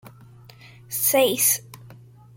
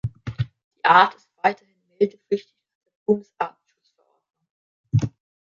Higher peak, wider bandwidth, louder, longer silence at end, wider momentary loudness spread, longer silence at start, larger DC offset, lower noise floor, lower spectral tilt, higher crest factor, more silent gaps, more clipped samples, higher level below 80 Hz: second, -6 dBFS vs -2 dBFS; first, 17 kHz vs 7.4 kHz; first, -20 LUFS vs -23 LUFS; about the same, 0.45 s vs 0.35 s; second, 9 LU vs 16 LU; about the same, 0.05 s vs 0.05 s; neither; second, -47 dBFS vs -68 dBFS; second, -2 dB/octave vs -7 dB/octave; about the same, 20 dB vs 24 dB; second, none vs 0.64-0.71 s, 2.75-2.81 s, 2.96-3.06 s, 4.50-4.84 s; neither; second, -64 dBFS vs -52 dBFS